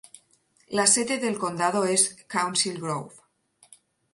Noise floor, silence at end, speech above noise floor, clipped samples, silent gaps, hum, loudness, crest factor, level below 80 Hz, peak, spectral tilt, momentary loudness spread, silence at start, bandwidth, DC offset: -64 dBFS; 1.05 s; 39 dB; under 0.1%; none; none; -24 LUFS; 22 dB; -72 dBFS; -6 dBFS; -2 dB/octave; 12 LU; 0.7 s; 12 kHz; under 0.1%